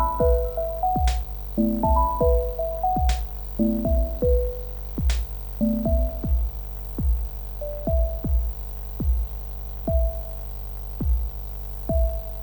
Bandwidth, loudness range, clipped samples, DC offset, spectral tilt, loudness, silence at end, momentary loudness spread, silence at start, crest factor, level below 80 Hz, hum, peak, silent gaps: over 20 kHz; 5 LU; under 0.1%; under 0.1%; -8 dB/octave; -26 LUFS; 0 s; 11 LU; 0 s; 14 dB; -26 dBFS; 50 Hz at -35 dBFS; -8 dBFS; none